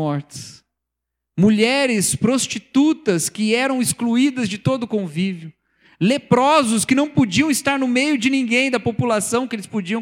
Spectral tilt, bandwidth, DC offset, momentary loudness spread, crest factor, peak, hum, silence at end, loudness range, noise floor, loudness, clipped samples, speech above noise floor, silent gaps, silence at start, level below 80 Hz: -4.5 dB/octave; 17 kHz; under 0.1%; 9 LU; 16 dB; -4 dBFS; none; 0 s; 3 LU; -81 dBFS; -18 LUFS; under 0.1%; 63 dB; none; 0 s; -56 dBFS